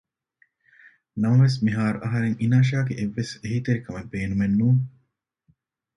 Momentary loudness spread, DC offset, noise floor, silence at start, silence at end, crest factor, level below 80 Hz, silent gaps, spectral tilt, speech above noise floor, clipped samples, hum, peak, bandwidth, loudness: 11 LU; under 0.1%; -72 dBFS; 1.15 s; 1.1 s; 16 dB; -52 dBFS; none; -7.5 dB/octave; 50 dB; under 0.1%; none; -8 dBFS; 10.5 kHz; -23 LUFS